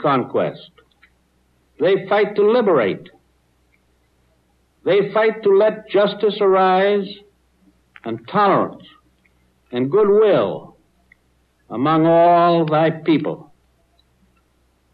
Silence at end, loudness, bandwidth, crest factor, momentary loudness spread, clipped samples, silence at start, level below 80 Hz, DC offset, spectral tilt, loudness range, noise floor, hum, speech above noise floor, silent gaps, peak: 1.5 s; -17 LUFS; 5.2 kHz; 12 dB; 15 LU; under 0.1%; 0 s; -64 dBFS; under 0.1%; -9 dB/octave; 4 LU; -61 dBFS; none; 45 dB; none; -6 dBFS